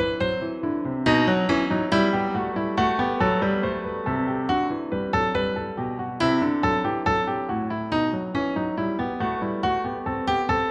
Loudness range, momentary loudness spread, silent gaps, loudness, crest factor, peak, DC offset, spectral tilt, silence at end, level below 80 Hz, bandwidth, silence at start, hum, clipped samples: 3 LU; 6 LU; none; -24 LUFS; 16 dB; -8 dBFS; under 0.1%; -6.5 dB/octave; 0 s; -46 dBFS; 9.6 kHz; 0 s; none; under 0.1%